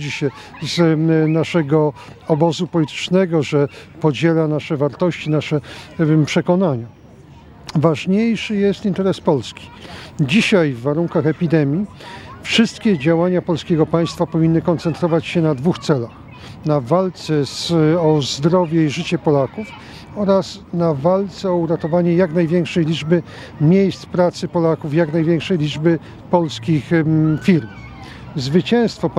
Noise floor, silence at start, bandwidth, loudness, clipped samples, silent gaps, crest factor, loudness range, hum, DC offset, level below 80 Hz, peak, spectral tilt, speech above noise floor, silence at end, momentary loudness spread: -42 dBFS; 0 s; 11 kHz; -17 LUFS; under 0.1%; none; 18 dB; 2 LU; none; under 0.1%; -50 dBFS; 0 dBFS; -7 dB/octave; 25 dB; 0 s; 11 LU